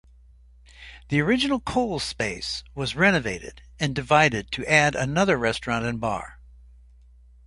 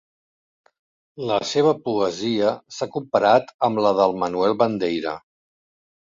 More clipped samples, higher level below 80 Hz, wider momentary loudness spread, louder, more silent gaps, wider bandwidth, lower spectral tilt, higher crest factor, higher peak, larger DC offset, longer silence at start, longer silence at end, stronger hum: neither; first, -46 dBFS vs -62 dBFS; first, 13 LU vs 10 LU; about the same, -23 LUFS vs -21 LUFS; second, none vs 3.54-3.59 s; first, 11.5 kHz vs 7.6 kHz; about the same, -4.5 dB/octave vs -5 dB/octave; first, 24 dB vs 18 dB; about the same, -2 dBFS vs -4 dBFS; neither; second, 0.8 s vs 1.15 s; first, 1.1 s vs 0.85 s; neither